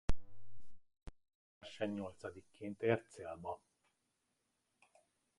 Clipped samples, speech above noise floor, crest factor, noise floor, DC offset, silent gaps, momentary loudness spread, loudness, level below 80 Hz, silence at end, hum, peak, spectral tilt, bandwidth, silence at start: under 0.1%; 43 dB; 22 dB; -84 dBFS; under 0.1%; 1.35-1.61 s; 24 LU; -43 LUFS; -54 dBFS; 1.8 s; none; -20 dBFS; -6.5 dB/octave; 11.5 kHz; 0.1 s